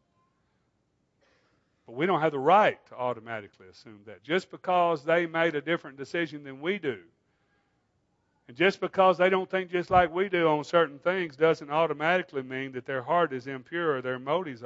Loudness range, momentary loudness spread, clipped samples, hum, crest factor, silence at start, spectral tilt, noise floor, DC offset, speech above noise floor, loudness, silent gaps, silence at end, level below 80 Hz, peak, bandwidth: 5 LU; 12 LU; under 0.1%; none; 22 dB; 1.9 s; -6 dB/octave; -74 dBFS; under 0.1%; 47 dB; -27 LUFS; none; 0 s; -62 dBFS; -8 dBFS; 8 kHz